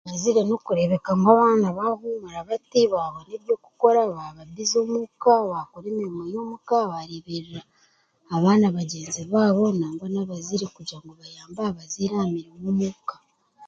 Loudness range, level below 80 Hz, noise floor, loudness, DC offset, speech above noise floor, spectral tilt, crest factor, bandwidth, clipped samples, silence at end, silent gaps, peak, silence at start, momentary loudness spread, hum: 7 LU; -64 dBFS; -63 dBFS; -23 LUFS; under 0.1%; 40 dB; -6 dB/octave; 22 dB; 7.8 kHz; under 0.1%; 0 s; none; -2 dBFS; 0.05 s; 16 LU; none